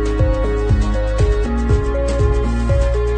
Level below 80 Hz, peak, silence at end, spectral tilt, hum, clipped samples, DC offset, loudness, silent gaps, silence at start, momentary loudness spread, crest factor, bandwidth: -18 dBFS; -4 dBFS; 0 s; -7.5 dB/octave; none; under 0.1%; under 0.1%; -18 LUFS; none; 0 s; 2 LU; 12 dB; 9.2 kHz